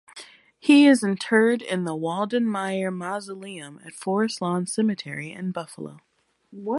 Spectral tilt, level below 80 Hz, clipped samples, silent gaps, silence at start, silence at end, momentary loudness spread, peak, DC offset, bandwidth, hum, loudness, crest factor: -5 dB/octave; -74 dBFS; under 0.1%; none; 0.15 s; 0 s; 20 LU; -6 dBFS; under 0.1%; 11.5 kHz; none; -23 LUFS; 18 dB